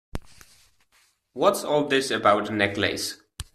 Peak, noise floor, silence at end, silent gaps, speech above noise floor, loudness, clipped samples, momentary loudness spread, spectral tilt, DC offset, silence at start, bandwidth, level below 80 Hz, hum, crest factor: -4 dBFS; -64 dBFS; 0.1 s; none; 41 dB; -23 LUFS; under 0.1%; 19 LU; -3.5 dB/octave; under 0.1%; 0.15 s; 14.5 kHz; -50 dBFS; none; 22 dB